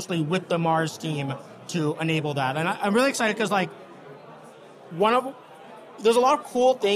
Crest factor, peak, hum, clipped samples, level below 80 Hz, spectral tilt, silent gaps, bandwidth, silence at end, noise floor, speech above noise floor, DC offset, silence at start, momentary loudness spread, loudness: 16 dB; -8 dBFS; none; under 0.1%; -72 dBFS; -5 dB/octave; none; 15 kHz; 0 s; -46 dBFS; 23 dB; under 0.1%; 0 s; 23 LU; -24 LUFS